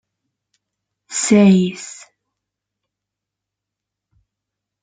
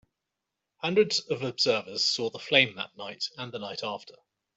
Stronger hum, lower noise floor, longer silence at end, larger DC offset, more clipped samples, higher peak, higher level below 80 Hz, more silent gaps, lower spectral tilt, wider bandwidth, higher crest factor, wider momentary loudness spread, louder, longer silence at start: neither; about the same, -83 dBFS vs -86 dBFS; first, 2.9 s vs 0.45 s; neither; neither; first, -2 dBFS vs -6 dBFS; first, -62 dBFS vs -76 dBFS; neither; first, -5.5 dB/octave vs -3 dB/octave; first, 9.6 kHz vs 8.2 kHz; about the same, 20 dB vs 24 dB; first, 21 LU vs 14 LU; first, -15 LUFS vs -27 LUFS; first, 1.1 s vs 0.85 s